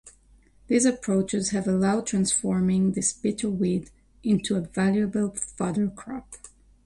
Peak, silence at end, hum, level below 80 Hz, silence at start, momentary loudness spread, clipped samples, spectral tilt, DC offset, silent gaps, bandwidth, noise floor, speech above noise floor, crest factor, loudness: -10 dBFS; 0.4 s; none; -54 dBFS; 0.05 s; 9 LU; under 0.1%; -5 dB/octave; under 0.1%; none; 11.5 kHz; -57 dBFS; 32 dB; 16 dB; -25 LUFS